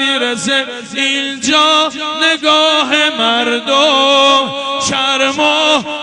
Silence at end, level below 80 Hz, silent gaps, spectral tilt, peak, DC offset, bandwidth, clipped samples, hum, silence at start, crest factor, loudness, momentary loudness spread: 0 s; -58 dBFS; none; -1.5 dB/octave; 0 dBFS; under 0.1%; 11 kHz; under 0.1%; none; 0 s; 12 dB; -11 LUFS; 6 LU